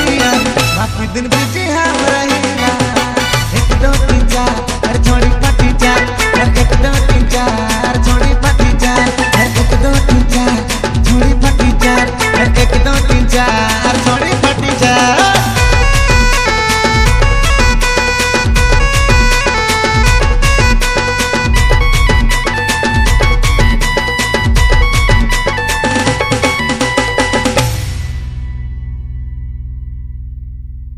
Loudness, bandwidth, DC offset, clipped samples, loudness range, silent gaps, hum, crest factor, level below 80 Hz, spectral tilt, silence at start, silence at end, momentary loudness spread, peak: -11 LUFS; 15 kHz; under 0.1%; 0.3%; 3 LU; none; none; 10 dB; -14 dBFS; -4.5 dB/octave; 0 s; 0 s; 6 LU; 0 dBFS